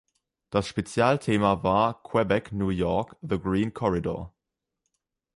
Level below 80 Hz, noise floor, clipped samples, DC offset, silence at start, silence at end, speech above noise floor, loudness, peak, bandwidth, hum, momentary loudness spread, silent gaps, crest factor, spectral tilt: -48 dBFS; -82 dBFS; under 0.1%; under 0.1%; 0.5 s; 1.1 s; 57 dB; -26 LUFS; -8 dBFS; 11.5 kHz; none; 7 LU; none; 20 dB; -6.5 dB/octave